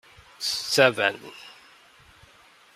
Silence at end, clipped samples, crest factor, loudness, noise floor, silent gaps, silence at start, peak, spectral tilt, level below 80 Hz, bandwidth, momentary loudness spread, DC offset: 1.25 s; under 0.1%; 26 dB; -23 LUFS; -55 dBFS; none; 0.4 s; -2 dBFS; -2.5 dB/octave; -68 dBFS; 16 kHz; 24 LU; under 0.1%